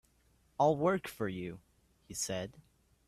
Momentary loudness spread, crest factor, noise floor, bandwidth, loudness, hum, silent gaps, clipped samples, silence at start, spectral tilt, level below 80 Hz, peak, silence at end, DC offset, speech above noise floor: 18 LU; 20 dB; -70 dBFS; 15.5 kHz; -34 LUFS; none; none; under 0.1%; 0.6 s; -5 dB/octave; -66 dBFS; -16 dBFS; 0.5 s; under 0.1%; 36 dB